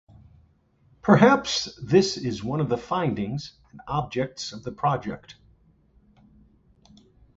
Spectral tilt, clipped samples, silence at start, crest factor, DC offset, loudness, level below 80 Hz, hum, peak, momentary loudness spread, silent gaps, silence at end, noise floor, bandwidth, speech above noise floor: -5.5 dB/octave; under 0.1%; 1.05 s; 22 dB; under 0.1%; -24 LUFS; -54 dBFS; none; -4 dBFS; 17 LU; none; 2.05 s; -61 dBFS; 8 kHz; 38 dB